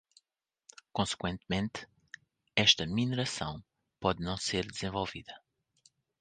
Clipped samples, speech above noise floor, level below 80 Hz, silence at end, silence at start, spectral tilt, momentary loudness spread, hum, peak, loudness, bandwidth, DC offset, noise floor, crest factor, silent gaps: under 0.1%; 54 dB; -56 dBFS; 0.85 s; 0.95 s; -3.5 dB/octave; 24 LU; none; -8 dBFS; -32 LUFS; 9.8 kHz; under 0.1%; -87 dBFS; 26 dB; none